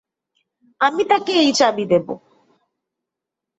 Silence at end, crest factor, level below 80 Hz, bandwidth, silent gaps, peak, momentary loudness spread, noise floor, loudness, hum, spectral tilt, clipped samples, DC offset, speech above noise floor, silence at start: 1.4 s; 18 dB; -64 dBFS; 8.2 kHz; none; -4 dBFS; 10 LU; -84 dBFS; -17 LUFS; none; -3.5 dB/octave; under 0.1%; under 0.1%; 67 dB; 0.8 s